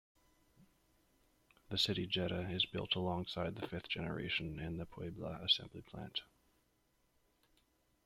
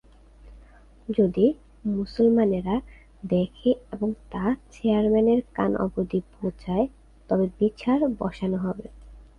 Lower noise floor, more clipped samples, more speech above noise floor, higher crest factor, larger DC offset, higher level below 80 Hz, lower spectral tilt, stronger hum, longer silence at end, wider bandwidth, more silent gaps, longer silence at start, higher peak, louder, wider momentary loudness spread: first, -77 dBFS vs -51 dBFS; neither; first, 37 dB vs 27 dB; first, 24 dB vs 18 dB; neither; second, -64 dBFS vs -48 dBFS; second, -5 dB/octave vs -9 dB/octave; neither; first, 1.8 s vs 0.15 s; first, 15.5 kHz vs 7 kHz; neither; first, 0.6 s vs 0.45 s; second, -20 dBFS vs -8 dBFS; second, -39 LUFS vs -25 LUFS; about the same, 11 LU vs 9 LU